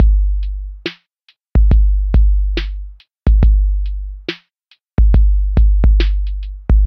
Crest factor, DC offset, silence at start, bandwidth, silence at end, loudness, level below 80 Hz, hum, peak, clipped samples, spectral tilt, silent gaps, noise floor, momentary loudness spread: 12 dB; under 0.1%; 0 s; 5.2 kHz; 0 s; -17 LUFS; -14 dBFS; none; 0 dBFS; under 0.1%; -8.5 dB/octave; none; -57 dBFS; 14 LU